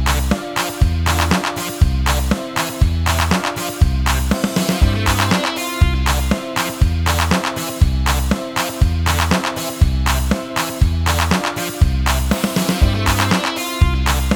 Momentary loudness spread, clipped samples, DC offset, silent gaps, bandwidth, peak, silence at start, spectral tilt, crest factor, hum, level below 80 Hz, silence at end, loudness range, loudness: 4 LU; under 0.1%; under 0.1%; none; 20 kHz; 0 dBFS; 0 s; -4.5 dB/octave; 16 dB; none; -22 dBFS; 0 s; 1 LU; -18 LUFS